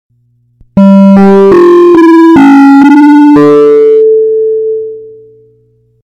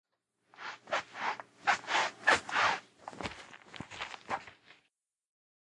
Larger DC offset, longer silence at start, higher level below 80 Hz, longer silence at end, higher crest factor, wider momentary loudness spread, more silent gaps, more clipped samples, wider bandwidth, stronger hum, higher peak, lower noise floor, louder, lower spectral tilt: neither; first, 0.75 s vs 0.6 s; first, -44 dBFS vs -70 dBFS; second, 0.95 s vs 1.2 s; second, 4 dB vs 26 dB; second, 9 LU vs 20 LU; neither; first, 20% vs under 0.1%; second, 8.2 kHz vs 11.5 kHz; neither; first, 0 dBFS vs -10 dBFS; second, -50 dBFS vs -80 dBFS; first, -3 LUFS vs -33 LUFS; first, -8.5 dB/octave vs -1.5 dB/octave